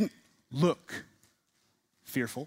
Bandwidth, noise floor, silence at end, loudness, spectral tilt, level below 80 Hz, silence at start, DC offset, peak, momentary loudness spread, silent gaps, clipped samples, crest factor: 16 kHz; -74 dBFS; 0 s; -33 LUFS; -6 dB/octave; -74 dBFS; 0 s; under 0.1%; -14 dBFS; 14 LU; none; under 0.1%; 20 dB